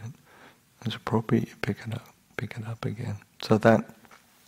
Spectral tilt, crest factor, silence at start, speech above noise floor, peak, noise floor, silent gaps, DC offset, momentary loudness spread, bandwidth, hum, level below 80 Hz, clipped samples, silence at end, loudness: -7 dB/octave; 26 dB; 0 s; 29 dB; -2 dBFS; -55 dBFS; none; under 0.1%; 17 LU; 16 kHz; none; -60 dBFS; under 0.1%; 0.6 s; -28 LUFS